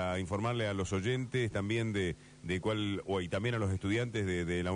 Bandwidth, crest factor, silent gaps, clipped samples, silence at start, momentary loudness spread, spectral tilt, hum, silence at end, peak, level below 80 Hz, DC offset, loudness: 10 kHz; 12 dB; none; under 0.1%; 0 s; 3 LU; -6 dB/octave; none; 0 s; -22 dBFS; -56 dBFS; under 0.1%; -34 LUFS